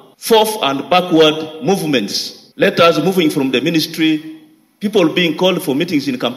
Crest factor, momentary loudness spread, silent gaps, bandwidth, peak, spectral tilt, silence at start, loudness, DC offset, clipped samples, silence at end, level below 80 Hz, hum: 14 dB; 9 LU; none; 16 kHz; 0 dBFS; -4.5 dB/octave; 0.2 s; -14 LUFS; under 0.1%; under 0.1%; 0 s; -60 dBFS; none